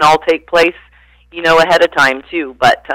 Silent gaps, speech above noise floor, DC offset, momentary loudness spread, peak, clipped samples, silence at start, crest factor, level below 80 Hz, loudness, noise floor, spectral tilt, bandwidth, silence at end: none; 34 dB; under 0.1%; 10 LU; -2 dBFS; under 0.1%; 0 s; 10 dB; -44 dBFS; -12 LUFS; -46 dBFS; -3.5 dB/octave; 17 kHz; 0 s